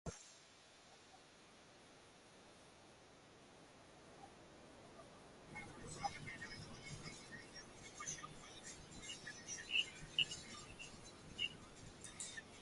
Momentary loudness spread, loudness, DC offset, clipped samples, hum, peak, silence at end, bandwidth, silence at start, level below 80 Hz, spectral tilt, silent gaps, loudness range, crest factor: 23 LU; -47 LUFS; under 0.1%; under 0.1%; none; -22 dBFS; 0 s; 11.5 kHz; 0.05 s; -70 dBFS; -1.5 dB/octave; none; 18 LU; 30 dB